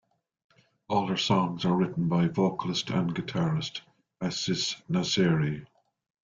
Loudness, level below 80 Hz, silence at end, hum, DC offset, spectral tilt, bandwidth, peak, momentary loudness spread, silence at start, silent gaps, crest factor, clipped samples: -28 LUFS; -62 dBFS; 0.6 s; none; under 0.1%; -5.5 dB/octave; 7.6 kHz; -10 dBFS; 7 LU; 0.9 s; none; 18 dB; under 0.1%